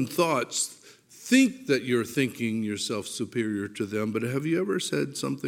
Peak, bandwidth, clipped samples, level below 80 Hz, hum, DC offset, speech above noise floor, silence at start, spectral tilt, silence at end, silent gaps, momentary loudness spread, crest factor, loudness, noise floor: -8 dBFS; 17 kHz; under 0.1%; -74 dBFS; none; under 0.1%; 22 dB; 0 s; -4.5 dB/octave; 0 s; none; 9 LU; 18 dB; -27 LUFS; -49 dBFS